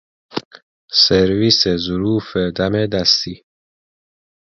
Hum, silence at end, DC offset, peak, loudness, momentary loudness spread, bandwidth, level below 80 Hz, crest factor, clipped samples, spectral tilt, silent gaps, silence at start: none; 1.25 s; under 0.1%; 0 dBFS; -15 LUFS; 17 LU; 7.6 kHz; -44 dBFS; 18 dB; under 0.1%; -4.5 dB/octave; 0.45-0.51 s, 0.62-0.88 s; 0.35 s